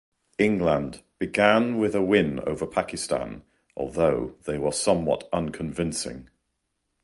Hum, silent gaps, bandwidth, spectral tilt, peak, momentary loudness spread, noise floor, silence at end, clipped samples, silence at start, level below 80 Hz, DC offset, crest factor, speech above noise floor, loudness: none; none; 11.5 kHz; -5 dB/octave; -4 dBFS; 14 LU; -77 dBFS; 0.8 s; under 0.1%; 0.4 s; -50 dBFS; under 0.1%; 20 dB; 53 dB; -25 LUFS